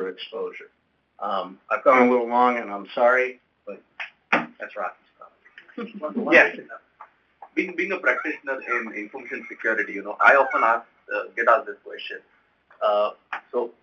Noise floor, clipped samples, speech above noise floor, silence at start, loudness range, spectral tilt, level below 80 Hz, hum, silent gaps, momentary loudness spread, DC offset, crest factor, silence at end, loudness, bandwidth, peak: -51 dBFS; under 0.1%; 28 dB; 0 s; 5 LU; -5 dB/octave; -76 dBFS; none; none; 20 LU; under 0.1%; 22 dB; 0.1 s; -22 LUFS; 7 kHz; -2 dBFS